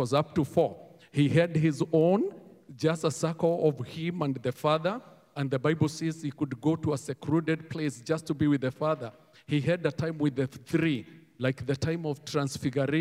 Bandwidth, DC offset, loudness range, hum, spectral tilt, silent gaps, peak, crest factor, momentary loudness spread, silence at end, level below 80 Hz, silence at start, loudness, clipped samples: 15 kHz; under 0.1%; 3 LU; none; -6.5 dB/octave; none; -10 dBFS; 18 dB; 8 LU; 0 s; -64 dBFS; 0 s; -29 LUFS; under 0.1%